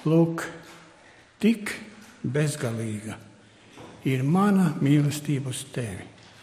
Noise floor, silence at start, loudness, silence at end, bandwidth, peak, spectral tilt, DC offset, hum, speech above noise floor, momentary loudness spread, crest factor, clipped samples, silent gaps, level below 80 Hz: -53 dBFS; 0 s; -26 LUFS; 0.3 s; 15 kHz; -8 dBFS; -6.5 dB/octave; under 0.1%; none; 29 dB; 21 LU; 18 dB; under 0.1%; none; -62 dBFS